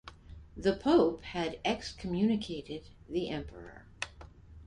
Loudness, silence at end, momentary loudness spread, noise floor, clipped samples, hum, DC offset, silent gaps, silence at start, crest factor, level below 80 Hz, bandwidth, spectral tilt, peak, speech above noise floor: -33 LUFS; 0 s; 23 LU; -52 dBFS; under 0.1%; none; under 0.1%; none; 0.05 s; 20 dB; -54 dBFS; 11 kHz; -6 dB/octave; -14 dBFS; 20 dB